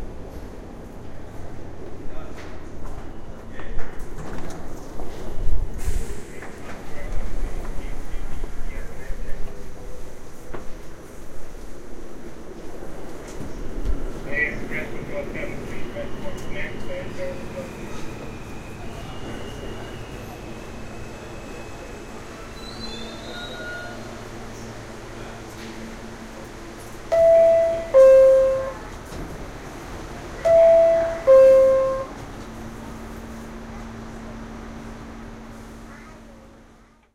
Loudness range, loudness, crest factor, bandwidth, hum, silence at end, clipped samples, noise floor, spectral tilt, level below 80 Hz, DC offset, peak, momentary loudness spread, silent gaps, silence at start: 21 LU; -21 LUFS; 18 dB; 13.5 kHz; none; 0.65 s; under 0.1%; -52 dBFS; -5.5 dB/octave; -34 dBFS; under 0.1%; -4 dBFS; 24 LU; none; 0 s